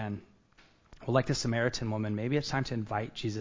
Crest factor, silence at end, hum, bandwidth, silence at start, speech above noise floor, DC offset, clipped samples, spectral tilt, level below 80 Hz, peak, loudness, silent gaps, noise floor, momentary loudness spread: 22 dB; 0 s; none; 7.6 kHz; 0 s; 32 dB; under 0.1%; under 0.1%; -5.5 dB/octave; -56 dBFS; -10 dBFS; -32 LUFS; none; -63 dBFS; 9 LU